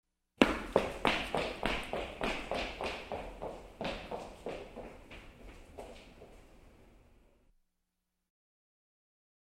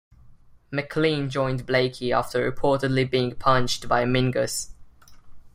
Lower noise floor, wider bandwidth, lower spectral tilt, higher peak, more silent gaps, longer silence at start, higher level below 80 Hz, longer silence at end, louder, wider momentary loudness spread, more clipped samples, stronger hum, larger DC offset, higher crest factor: first, -85 dBFS vs -50 dBFS; about the same, 16 kHz vs 16 kHz; about the same, -4.5 dB/octave vs -5 dB/octave; about the same, -4 dBFS vs -4 dBFS; neither; first, 0.4 s vs 0.25 s; second, -52 dBFS vs -46 dBFS; first, 2.5 s vs 0.05 s; second, -36 LUFS vs -24 LUFS; first, 22 LU vs 7 LU; neither; neither; neither; first, 34 dB vs 20 dB